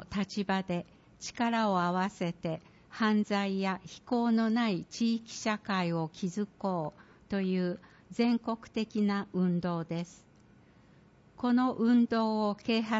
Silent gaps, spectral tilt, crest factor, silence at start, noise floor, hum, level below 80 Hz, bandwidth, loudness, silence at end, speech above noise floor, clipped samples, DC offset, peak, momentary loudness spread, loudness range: none; -6 dB/octave; 14 dB; 0 s; -60 dBFS; none; -66 dBFS; 8 kHz; -31 LUFS; 0 s; 30 dB; under 0.1%; under 0.1%; -16 dBFS; 10 LU; 3 LU